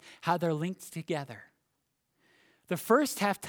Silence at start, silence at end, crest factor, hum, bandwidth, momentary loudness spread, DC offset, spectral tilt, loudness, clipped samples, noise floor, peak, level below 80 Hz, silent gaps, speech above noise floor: 0.05 s; 0 s; 22 dB; none; over 20 kHz; 15 LU; under 0.1%; -5 dB/octave; -31 LUFS; under 0.1%; -80 dBFS; -10 dBFS; -78 dBFS; none; 49 dB